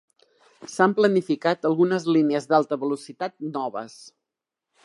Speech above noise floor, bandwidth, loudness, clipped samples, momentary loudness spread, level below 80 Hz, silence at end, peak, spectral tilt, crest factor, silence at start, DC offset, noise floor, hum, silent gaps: 64 dB; 11.5 kHz; -23 LUFS; under 0.1%; 14 LU; -78 dBFS; 0.95 s; -4 dBFS; -6 dB/octave; 20 dB; 0.6 s; under 0.1%; -86 dBFS; none; none